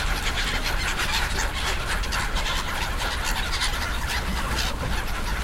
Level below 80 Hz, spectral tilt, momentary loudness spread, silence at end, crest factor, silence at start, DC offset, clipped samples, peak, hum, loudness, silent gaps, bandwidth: -28 dBFS; -2.5 dB/octave; 3 LU; 0 s; 14 dB; 0 s; under 0.1%; under 0.1%; -10 dBFS; none; -26 LUFS; none; 16.5 kHz